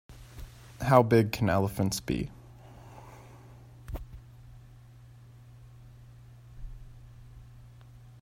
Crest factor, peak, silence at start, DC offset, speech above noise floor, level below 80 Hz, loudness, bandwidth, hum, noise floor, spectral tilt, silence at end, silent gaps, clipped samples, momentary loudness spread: 26 dB; -6 dBFS; 0.1 s; under 0.1%; 27 dB; -50 dBFS; -27 LUFS; 16 kHz; none; -52 dBFS; -6.5 dB/octave; 0.6 s; none; under 0.1%; 28 LU